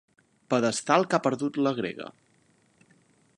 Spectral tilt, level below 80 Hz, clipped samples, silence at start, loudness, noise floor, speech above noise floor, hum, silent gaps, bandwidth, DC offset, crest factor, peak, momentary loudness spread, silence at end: -4.5 dB/octave; -74 dBFS; under 0.1%; 0.5 s; -26 LUFS; -65 dBFS; 39 dB; none; none; 11.5 kHz; under 0.1%; 22 dB; -6 dBFS; 13 LU; 1.25 s